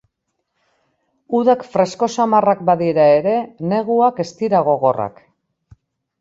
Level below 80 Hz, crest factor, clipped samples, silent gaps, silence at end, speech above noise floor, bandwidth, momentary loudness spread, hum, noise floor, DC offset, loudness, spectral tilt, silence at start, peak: -62 dBFS; 16 dB; under 0.1%; none; 1.1 s; 58 dB; 7.8 kHz; 8 LU; none; -74 dBFS; under 0.1%; -16 LUFS; -6.5 dB/octave; 1.3 s; -2 dBFS